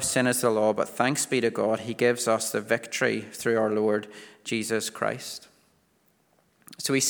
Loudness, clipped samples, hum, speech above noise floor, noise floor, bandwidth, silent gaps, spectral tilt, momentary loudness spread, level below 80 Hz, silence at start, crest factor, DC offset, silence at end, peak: -26 LUFS; under 0.1%; none; 41 dB; -67 dBFS; over 20 kHz; none; -3.5 dB/octave; 9 LU; -70 dBFS; 0 s; 20 dB; under 0.1%; 0 s; -6 dBFS